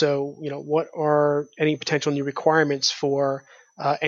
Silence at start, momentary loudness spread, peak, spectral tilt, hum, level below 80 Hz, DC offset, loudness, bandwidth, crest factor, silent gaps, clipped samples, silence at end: 0 s; 8 LU; -4 dBFS; -4.5 dB/octave; none; -74 dBFS; under 0.1%; -23 LUFS; 7.6 kHz; 18 dB; none; under 0.1%; 0 s